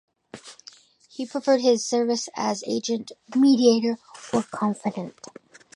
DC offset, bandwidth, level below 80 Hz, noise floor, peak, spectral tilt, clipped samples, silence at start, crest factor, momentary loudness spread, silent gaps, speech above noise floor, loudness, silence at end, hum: under 0.1%; 11 kHz; -70 dBFS; -51 dBFS; -6 dBFS; -4.5 dB/octave; under 0.1%; 0.35 s; 18 dB; 23 LU; none; 28 dB; -23 LUFS; 0.65 s; none